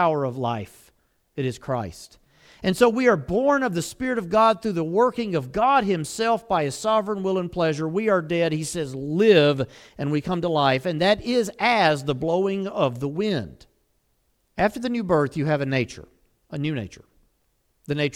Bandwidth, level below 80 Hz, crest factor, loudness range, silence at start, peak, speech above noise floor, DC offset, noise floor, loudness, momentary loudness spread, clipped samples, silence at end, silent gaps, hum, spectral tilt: 16.5 kHz; -52 dBFS; 20 dB; 5 LU; 0 s; -2 dBFS; 46 dB; under 0.1%; -68 dBFS; -23 LUFS; 11 LU; under 0.1%; 0.05 s; none; none; -5.5 dB/octave